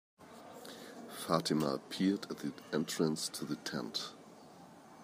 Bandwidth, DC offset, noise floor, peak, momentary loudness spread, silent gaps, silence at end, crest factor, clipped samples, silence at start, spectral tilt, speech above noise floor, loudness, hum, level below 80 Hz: 15.5 kHz; under 0.1%; -56 dBFS; -14 dBFS; 22 LU; none; 0 s; 24 dB; under 0.1%; 0.2 s; -4.5 dB/octave; 20 dB; -37 LUFS; none; -78 dBFS